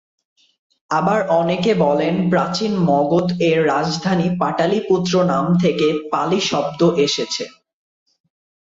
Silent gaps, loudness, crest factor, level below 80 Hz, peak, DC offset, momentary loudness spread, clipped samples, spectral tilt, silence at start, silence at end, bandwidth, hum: none; -18 LUFS; 14 dB; -56 dBFS; -4 dBFS; under 0.1%; 4 LU; under 0.1%; -5.5 dB/octave; 0.9 s; 1.25 s; 7.8 kHz; none